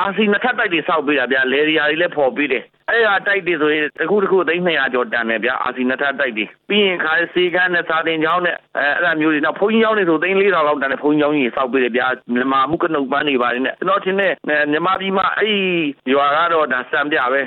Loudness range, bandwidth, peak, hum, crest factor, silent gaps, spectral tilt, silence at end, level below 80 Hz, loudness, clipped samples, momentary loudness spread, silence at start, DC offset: 1 LU; 4.3 kHz; -4 dBFS; none; 12 dB; none; -8 dB/octave; 0 s; -60 dBFS; -16 LUFS; under 0.1%; 4 LU; 0 s; under 0.1%